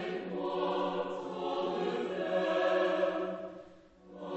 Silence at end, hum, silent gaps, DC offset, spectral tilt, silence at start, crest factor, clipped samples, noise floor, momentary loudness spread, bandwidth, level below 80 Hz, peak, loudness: 0 s; none; none; under 0.1%; -6 dB/octave; 0 s; 16 dB; under 0.1%; -56 dBFS; 11 LU; 8.2 kHz; -72 dBFS; -18 dBFS; -33 LUFS